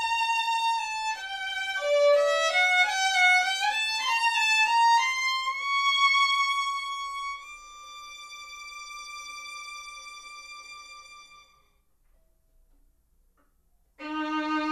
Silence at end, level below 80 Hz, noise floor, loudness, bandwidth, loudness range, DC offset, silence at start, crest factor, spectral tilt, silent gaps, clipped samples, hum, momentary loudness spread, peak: 0 s; -66 dBFS; -66 dBFS; -24 LUFS; 15.5 kHz; 20 LU; under 0.1%; 0 s; 18 dB; 1 dB/octave; none; under 0.1%; none; 21 LU; -10 dBFS